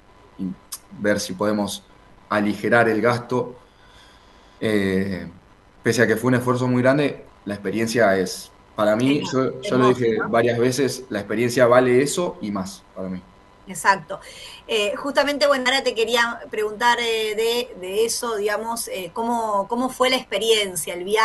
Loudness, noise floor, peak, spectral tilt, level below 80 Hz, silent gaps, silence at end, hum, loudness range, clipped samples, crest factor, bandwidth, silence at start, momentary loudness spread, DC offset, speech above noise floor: -21 LUFS; -50 dBFS; -2 dBFS; -4.5 dB/octave; -56 dBFS; none; 0 s; none; 4 LU; under 0.1%; 20 dB; 12.5 kHz; 0.4 s; 14 LU; under 0.1%; 29 dB